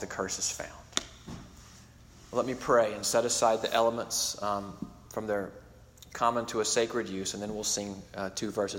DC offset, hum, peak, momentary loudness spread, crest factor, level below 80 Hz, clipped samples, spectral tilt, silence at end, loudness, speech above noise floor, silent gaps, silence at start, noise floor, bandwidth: under 0.1%; none; -4 dBFS; 16 LU; 28 dB; -58 dBFS; under 0.1%; -2.5 dB/octave; 0 s; -30 LUFS; 23 dB; none; 0 s; -54 dBFS; 16.5 kHz